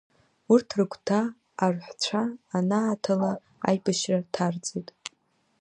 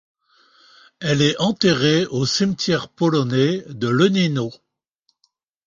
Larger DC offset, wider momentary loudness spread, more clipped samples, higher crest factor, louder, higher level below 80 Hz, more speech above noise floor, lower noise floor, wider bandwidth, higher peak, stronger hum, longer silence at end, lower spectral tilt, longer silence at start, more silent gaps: neither; first, 10 LU vs 6 LU; neither; about the same, 20 dB vs 18 dB; second, -27 LUFS vs -19 LUFS; second, -72 dBFS vs -58 dBFS; second, 43 dB vs 51 dB; about the same, -69 dBFS vs -69 dBFS; first, 10 kHz vs 7.6 kHz; about the same, -6 dBFS vs -4 dBFS; neither; second, 0.5 s vs 1.15 s; about the same, -5.5 dB/octave vs -5.5 dB/octave; second, 0.5 s vs 1 s; neither